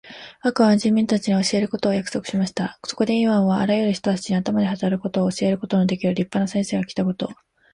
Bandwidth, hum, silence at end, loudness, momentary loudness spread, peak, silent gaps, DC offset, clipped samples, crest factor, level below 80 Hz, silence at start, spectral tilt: 11 kHz; none; 0.4 s; -21 LUFS; 7 LU; -6 dBFS; none; under 0.1%; under 0.1%; 16 dB; -58 dBFS; 0.05 s; -6 dB/octave